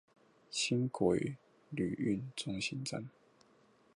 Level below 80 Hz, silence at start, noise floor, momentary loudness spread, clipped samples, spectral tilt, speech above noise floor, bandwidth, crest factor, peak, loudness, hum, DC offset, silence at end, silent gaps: -66 dBFS; 0.5 s; -68 dBFS; 13 LU; under 0.1%; -5 dB/octave; 32 dB; 11.5 kHz; 20 dB; -18 dBFS; -37 LUFS; none; under 0.1%; 0.85 s; none